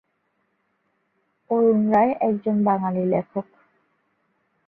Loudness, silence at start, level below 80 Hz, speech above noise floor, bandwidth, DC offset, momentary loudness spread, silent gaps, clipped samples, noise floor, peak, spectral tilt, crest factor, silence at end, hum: -21 LUFS; 1.5 s; -66 dBFS; 51 dB; 3.3 kHz; under 0.1%; 8 LU; none; under 0.1%; -71 dBFS; -8 dBFS; -11.5 dB/octave; 16 dB; 1.25 s; none